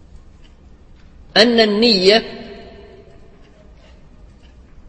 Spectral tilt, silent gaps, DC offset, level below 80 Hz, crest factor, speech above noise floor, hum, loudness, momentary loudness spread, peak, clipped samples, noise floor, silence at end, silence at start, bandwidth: -4 dB/octave; none; under 0.1%; -44 dBFS; 20 dB; 31 dB; none; -13 LUFS; 24 LU; 0 dBFS; under 0.1%; -44 dBFS; 2.25 s; 1.35 s; 8.8 kHz